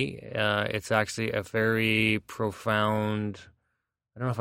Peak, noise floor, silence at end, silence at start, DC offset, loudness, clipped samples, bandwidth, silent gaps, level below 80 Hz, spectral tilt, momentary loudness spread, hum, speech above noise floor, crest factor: -8 dBFS; -81 dBFS; 0 s; 0 s; under 0.1%; -27 LUFS; under 0.1%; 16 kHz; none; -60 dBFS; -5.5 dB/octave; 9 LU; none; 53 dB; 22 dB